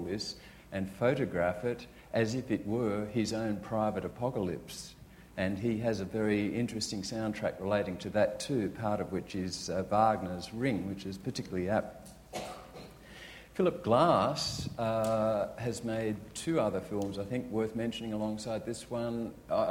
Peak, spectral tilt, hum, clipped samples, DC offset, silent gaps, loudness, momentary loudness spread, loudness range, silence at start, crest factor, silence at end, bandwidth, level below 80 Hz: -12 dBFS; -5.5 dB/octave; none; under 0.1%; under 0.1%; none; -33 LUFS; 12 LU; 4 LU; 0 s; 20 dB; 0 s; 16.5 kHz; -58 dBFS